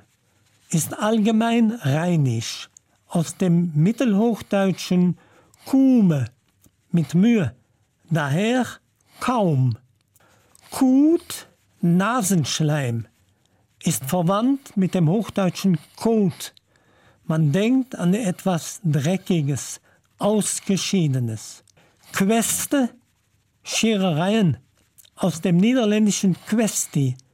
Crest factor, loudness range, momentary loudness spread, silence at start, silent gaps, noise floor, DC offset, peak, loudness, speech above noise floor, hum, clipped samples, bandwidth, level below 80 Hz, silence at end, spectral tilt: 12 dB; 3 LU; 10 LU; 0.7 s; none; -65 dBFS; under 0.1%; -10 dBFS; -21 LUFS; 45 dB; none; under 0.1%; 16.5 kHz; -62 dBFS; 0.15 s; -5.5 dB/octave